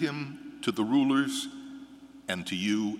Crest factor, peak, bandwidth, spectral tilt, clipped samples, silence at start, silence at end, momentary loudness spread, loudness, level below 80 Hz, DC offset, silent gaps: 18 dB; -12 dBFS; 14.5 kHz; -4.5 dB/octave; under 0.1%; 0 s; 0 s; 20 LU; -29 LUFS; -72 dBFS; under 0.1%; none